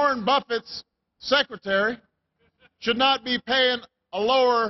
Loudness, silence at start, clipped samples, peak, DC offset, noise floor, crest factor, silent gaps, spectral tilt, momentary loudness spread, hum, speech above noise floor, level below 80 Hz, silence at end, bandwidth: -23 LUFS; 0 s; under 0.1%; -8 dBFS; under 0.1%; -69 dBFS; 16 dB; none; -4 dB/octave; 15 LU; none; 46 dB; -64 dBFS; 0 s; 6.2 kHz